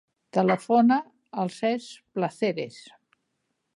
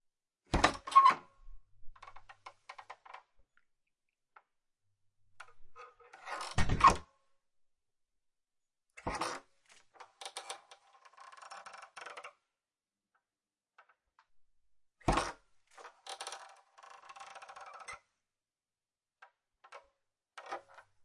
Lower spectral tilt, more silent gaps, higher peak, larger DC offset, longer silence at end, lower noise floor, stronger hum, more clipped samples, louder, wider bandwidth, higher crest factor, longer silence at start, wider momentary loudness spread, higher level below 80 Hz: first, -6.5 dB/octave vs -4 dB/octave; neither; about the same, -8 dBFS vs -10 dBFS; neither; first, 0.95 s vs 0.45 s; second, -78 dBFS vs under -90 dBFS; neither; neither; first, -26 LUFS vs -32 LUFS; about the same, 11.5 kHz vs 11.5 kHz; second, 18 dB vs 28 dB; second, 0.35 s vs 0.5 s; second, 14 LU vs 29 LU; second, -78 dBFS vs -52 dBFS